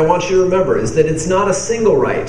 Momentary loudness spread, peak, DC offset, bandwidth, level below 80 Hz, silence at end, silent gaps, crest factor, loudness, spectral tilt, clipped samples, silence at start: 2 LU; 0 dBFS; 2%; 10.5 kHz; -36 dBFS; 0 s; none; 14 dB; -14 LUFS; -5 dB/octave; under 0.1%; 0 s